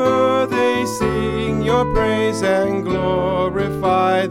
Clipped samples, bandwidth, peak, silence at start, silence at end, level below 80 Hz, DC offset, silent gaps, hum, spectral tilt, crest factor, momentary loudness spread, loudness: under 0.1%; 16.5 kHz; -4 dBFS; 0 s; 0 s; -34 dBFS; 0.2%; none; none; -6 dB/octave; 14 dB; 4 LU; -18 LUFS